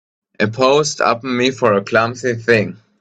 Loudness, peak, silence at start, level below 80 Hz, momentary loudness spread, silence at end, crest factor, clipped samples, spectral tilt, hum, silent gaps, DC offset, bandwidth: -16 LUFS; 0 dBFS; 0.4 s; -56 dBFS; 7 LU; 0.25 s; 16 dB; under 0.1%; -4.5 dB/octave; none; none; under 0.1%; 9.2 kHz